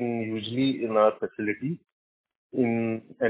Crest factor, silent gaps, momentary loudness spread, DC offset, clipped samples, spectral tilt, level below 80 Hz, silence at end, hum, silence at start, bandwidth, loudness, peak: 18 dB; 1.92-2.24 s, 2.36-2.50 s; 11 LU; under 0.1%; under 0.1%; -10.5 dB/octave; -68 dBFS; 0 s; none; 0 s; 4 kHz; -27 LUFS; -8 dBFS